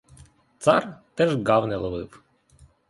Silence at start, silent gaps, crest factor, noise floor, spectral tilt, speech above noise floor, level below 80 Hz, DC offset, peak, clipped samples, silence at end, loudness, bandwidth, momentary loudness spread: 0.6 s; none; 22 dB; -56 dBFS; -6 dB/octave; 34 dB; -52 dBFS; under 0.1%; -4 dBFS; under 0.1%; 0.8 s; -23 LUFS; 11.5 kHz; 15 LU